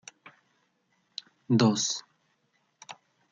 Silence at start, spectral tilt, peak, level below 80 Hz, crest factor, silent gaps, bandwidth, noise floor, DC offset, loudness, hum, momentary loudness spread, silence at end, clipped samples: 1.5 s; -4.5 dB/octave; -8 dBFS; -76 dBFS; 24 dB; none; 9.4 kHz; -73 dBFS; under 0.1%; -26 LUFS; none; 25 LU; 0.4 s; under 0.1%